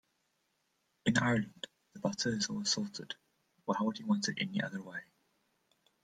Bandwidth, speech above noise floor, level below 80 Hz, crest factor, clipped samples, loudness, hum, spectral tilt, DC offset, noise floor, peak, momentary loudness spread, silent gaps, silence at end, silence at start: 9.6 kHz; 45 dB; -72 dBFS; 24 dB; under 0.1%; -35 LUFS; none; -4 dB/octave; under 0.1%; -79 dBFS; -14 dBFS; 15 LU; none; 1 s; 1.05 s